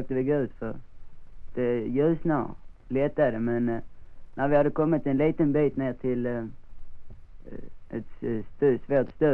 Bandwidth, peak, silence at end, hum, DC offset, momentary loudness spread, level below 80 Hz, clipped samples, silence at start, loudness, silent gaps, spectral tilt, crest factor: 4.3 kHz; -12 dBFS; 0 s; none; under 0.1%; 15 LU; -46 dBFS; under 0.1%; 0 s; -27 LUFS; none; -10.5 dB/octave; 16 dB